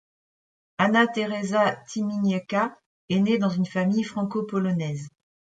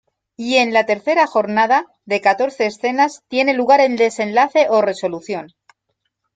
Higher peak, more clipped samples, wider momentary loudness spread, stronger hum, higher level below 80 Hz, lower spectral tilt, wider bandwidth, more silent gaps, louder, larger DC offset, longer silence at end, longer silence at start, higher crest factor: second, -6 dBFS vs -2 dBFS; neither; about the same, 9 LU vs 10 LU; neither; about the same, -68 dBFS vs -68 dBFS; first, -6.5 dB/octave vs -4 dB/octave; about the same, 9 kHz vs 9.4 kHz; first, 2.86-3.08 s vs none; second, -25 LUFS vs -16 LUFS; neither; second, 0.5 s vs 0.9 s; first, 0.8 s vs 0.4 s; about the same, 20 dB vs 16 dB